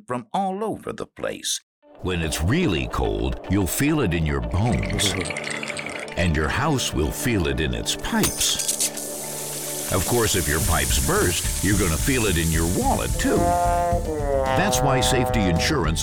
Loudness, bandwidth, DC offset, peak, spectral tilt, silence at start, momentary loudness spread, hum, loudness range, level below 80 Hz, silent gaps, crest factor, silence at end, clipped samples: -22 LUFS; 19 kHz; 0.3%; -10 dBFS; -4 dB/octave; 0.1 s; 8 LU; none; 3 LU; -32 dBFS; 1.63-1.82 s; 14 dB; 0 s; under 0.1%